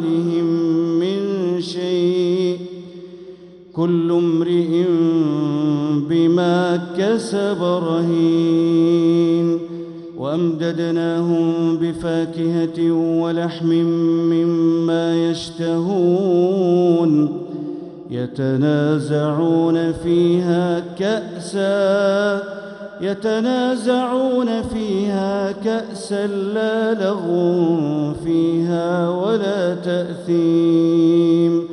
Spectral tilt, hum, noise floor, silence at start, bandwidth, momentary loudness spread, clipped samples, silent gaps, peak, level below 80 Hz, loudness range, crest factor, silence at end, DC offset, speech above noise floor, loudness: -7.5 dB/octave; none; -39 dBFS; 0 s; 10.5 kHz; 8 LU; under 0.1%; none; -4 dBFS; -54 dBFS; 3 LU; 14 dB; 0 s; under 0.1%; 22 dB; -18 LUFS